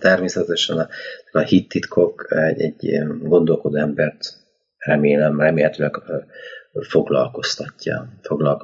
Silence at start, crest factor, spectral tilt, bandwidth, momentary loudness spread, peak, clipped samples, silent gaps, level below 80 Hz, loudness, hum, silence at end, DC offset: 0 s; 18 dB; -5.5 dB/octave; 7.8 kHz; 13 LU; -2 dBFS; under 0.1%; none; -58 dBFS; -19 LUFS; none; 0 s; under 0.1%